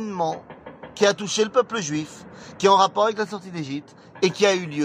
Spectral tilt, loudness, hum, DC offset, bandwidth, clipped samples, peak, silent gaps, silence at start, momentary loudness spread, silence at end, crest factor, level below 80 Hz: -4 dB/octave; -22 LUFS; none; under 0.1%; 10.5 kHz; under 0.1%; -4 dBFS; none; 0 s; 21 LU; 0 s; 20 dB; -66 dBFS